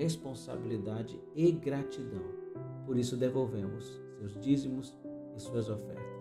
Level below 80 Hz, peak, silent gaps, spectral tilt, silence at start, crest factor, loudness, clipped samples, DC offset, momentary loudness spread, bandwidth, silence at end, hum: -66 dBFS; -16 dBFS; none; -7 dB/octave; 0 s; 18 dB; -36 LUFS; under 0.1%; under 0.1%; 14 LU; 14 kHz; 0 s; none